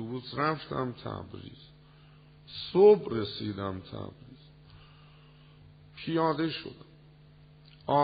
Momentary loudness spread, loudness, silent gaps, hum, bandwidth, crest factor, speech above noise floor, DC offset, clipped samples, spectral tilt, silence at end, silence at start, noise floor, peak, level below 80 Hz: 24 LU; -29 LUFS; none; none; 4.9 kHz; 20 dB; 27 dB; under 0.1%; under 0.1%; -5 dB/octave; 0 s; 0 s; -56 dBFS; -10 dBFS; -62 dBFS